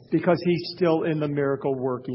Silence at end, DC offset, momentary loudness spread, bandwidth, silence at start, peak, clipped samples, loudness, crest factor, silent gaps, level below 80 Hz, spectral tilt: 0 s; under 0.1%; 4 LU; 5.8 kHz; 0.1 s; -6 dBFS; under 0.1%; -24 LUFS; 18 dB; none; -62 dBFS; -11.5 dB/octave